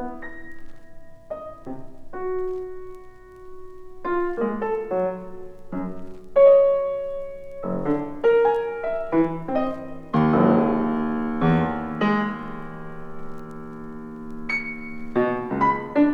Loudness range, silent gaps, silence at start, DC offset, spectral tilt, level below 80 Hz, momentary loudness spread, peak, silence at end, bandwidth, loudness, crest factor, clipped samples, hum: 11 LU; none; 0 s; under 0.1%; -9 dB/octave; -46 dBFS; 21 LU; -6 dBFS; 0 s; 7 kHz; -23 LUFS; 18 dB; under 0.1%; none